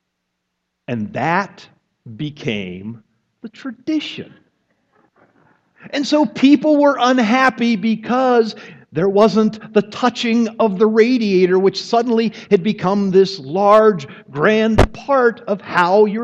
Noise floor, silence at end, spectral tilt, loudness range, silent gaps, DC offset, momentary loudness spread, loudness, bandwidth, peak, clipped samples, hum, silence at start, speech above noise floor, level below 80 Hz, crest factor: -74 dBFS; 0 s; -6 dB/octave; 12 LU; none; under 0.1%; 14 LU; -16 LUFS; 9.4 kHz; 0 dBFS; under 0.1%; none; 0.9 s; 59 dB; -38 dBFS; 16 dB